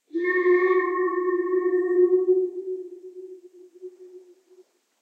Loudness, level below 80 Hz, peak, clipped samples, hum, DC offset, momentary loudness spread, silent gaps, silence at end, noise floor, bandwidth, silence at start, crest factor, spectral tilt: -22 LUFS; under -90 dBFS; -10 dBFS; under 0.1%; none; under 0.1%; 24 LU; none; 0.85 s; -57 dBFS; 4.2 kHz; 0.15 s; 14 dB; -5.5 dB/octave